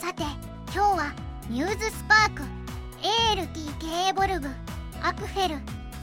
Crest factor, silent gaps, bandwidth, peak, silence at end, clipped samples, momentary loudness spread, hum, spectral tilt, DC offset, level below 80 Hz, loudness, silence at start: 20 dB; none; 17 kHz; -6 dBFS; 0 s; under 0.1%; 17 LU; none; -3.5 dB/octave; under 0.1%; -40 dBFS; -26 LUFS; 0 s